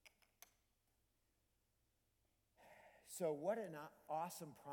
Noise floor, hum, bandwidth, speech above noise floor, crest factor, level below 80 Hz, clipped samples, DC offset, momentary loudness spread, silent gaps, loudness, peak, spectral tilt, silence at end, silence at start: -84 dBFS; none; 19 kHz; 38 dB; 20 dB; -88 dBFS; under 0.1%; under 0.1%; 24 LU; none; -47 LUFS; -30 dBFS; -5 dB/octave; 0 s; 0.05 s